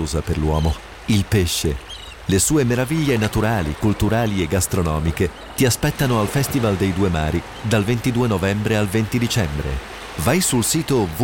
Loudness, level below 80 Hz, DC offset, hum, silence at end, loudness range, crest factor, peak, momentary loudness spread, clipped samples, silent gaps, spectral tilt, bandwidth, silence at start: -20 LUFS; -32 dBFS; 0.2%; none; 0 s; 1 LU; 14 dB; -6 dBFS; 6 LU; under 0.1%; none; -5 dB/octave; 17 kHz; 0 s